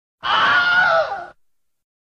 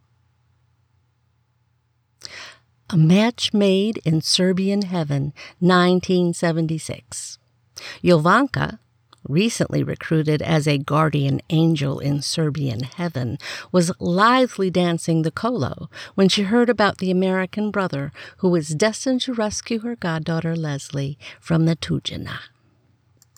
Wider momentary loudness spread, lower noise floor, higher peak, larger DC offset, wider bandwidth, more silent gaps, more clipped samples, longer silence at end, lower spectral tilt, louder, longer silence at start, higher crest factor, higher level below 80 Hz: second, 11 LU vs 14 LU; about the same, -66 dBFS vs -66 dBFS; about the same, -6 dBFS vs -4 dBFS; neither; second, 8.4 kHz vs 14 kHz; neither; neither; about the same, 0.8 s vs 0.9 s; second, -2.5 dB/octave vs -5.5 dB/octave; first, -16 LUFS vs -20 LUFS; second, 0.25 s vs 2.3 s; about the same, 14 dB vs 18 dB; about the same, -58 dBFS vs -54 dBFS